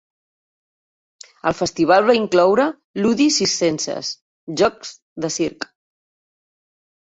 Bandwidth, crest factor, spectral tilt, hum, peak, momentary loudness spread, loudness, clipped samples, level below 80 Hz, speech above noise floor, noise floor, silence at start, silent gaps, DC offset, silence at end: 8.2 kHz; 18 dB; -3.5 dB/octave; none; -2 dBFS; 16 LU; -18 LUFS; under 0.1%; -58 dBFS; over 72 dB; under -90 dBFS; 1.45 s; 2.84-2.94 s, 4.22-4.47 s, 5.02-5.16 s; under 0.1%; 1.45 s